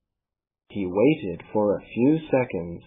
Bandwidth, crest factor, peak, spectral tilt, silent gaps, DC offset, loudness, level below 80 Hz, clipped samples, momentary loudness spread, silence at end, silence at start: 3.8 kHz; 16 dB; -8 dBFS; -11.5 dB/octave; none; under 0.1%; -24 LUFS; -58 dBFS; under 0.1%; 8 LU; 0.05 s; 0.7 s